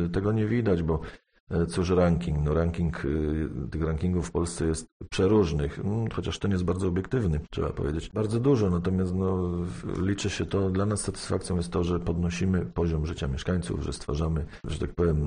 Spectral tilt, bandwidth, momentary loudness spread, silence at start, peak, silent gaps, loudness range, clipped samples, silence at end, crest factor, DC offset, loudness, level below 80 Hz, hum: -7 dB/octave; 10 kHz; 8 LU; 0 s; -10 dBFS; 1.40-1.47 s, 4.92-5.00 s; 2 LU; under 0.1%; 0 s; 16 dB; under 0.1%; -28 LUFS; -38 dBFS; none